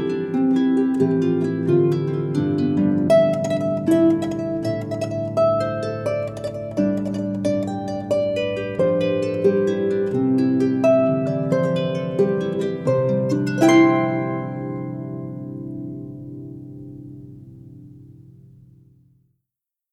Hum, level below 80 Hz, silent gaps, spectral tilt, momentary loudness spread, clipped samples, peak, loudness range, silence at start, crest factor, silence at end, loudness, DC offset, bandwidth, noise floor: none; -56 dBFS; none; -7.5 dB/octave; 15 LU; under 0.1%; -4 dBFS; 14 LU; 0 s; 16 dB; 1.6 s; -20 LUFS; under 0.1%; 12.5 kHz; -85 dBFS